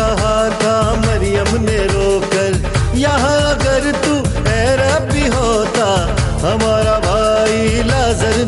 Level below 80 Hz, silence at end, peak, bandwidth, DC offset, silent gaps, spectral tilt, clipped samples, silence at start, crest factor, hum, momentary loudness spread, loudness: -22 dBFS; 0 s; -2 dBFS; 11.5 kHz; under 0.1%; none; -5 dB/octave; under 0.1%; 0 s; 10 dB; none; 3 LU; -14 LUFS